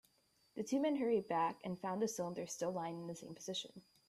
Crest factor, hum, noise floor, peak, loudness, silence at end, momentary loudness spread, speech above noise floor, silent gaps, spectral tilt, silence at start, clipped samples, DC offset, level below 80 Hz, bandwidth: 16 dB; none; -76 dBFS; -26 dBFS; -40 LUFS; 0.3 s; 12 LU; 36 dB; none; -4.5 dB/octave; 0.55 s; under 0.1%; under 0.1%; -82 dBFS; 15 kHz